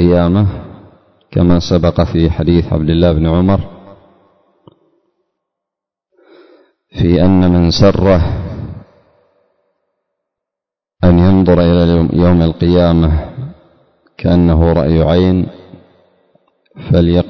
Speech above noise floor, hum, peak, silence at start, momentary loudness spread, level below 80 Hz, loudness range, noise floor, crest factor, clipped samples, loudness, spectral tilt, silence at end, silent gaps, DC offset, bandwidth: 75 dB; none; 0 dBFS; 0 s; 14 LU; -24 dBFS; 7 LU; -85 dBFS; 12 dB; under 0.1%; -11 LUFS; -8.5 dB/octave; 0 s; none; under 0.1%; 6.4 kHz